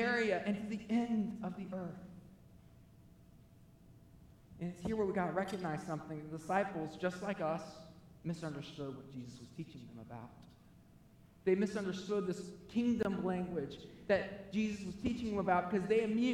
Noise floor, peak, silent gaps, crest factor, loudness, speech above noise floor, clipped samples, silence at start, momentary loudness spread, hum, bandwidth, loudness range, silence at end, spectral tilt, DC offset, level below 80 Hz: -62 dBFS; -20 dBFS; none; 20 dB; -38 LUFS; 24 dB; under 0.1%; 0 s; 17 LU; none; 12.5 kHz; 11 LU; 0 s; -6.5 dB/octave; under 0.1%; -66 dBFS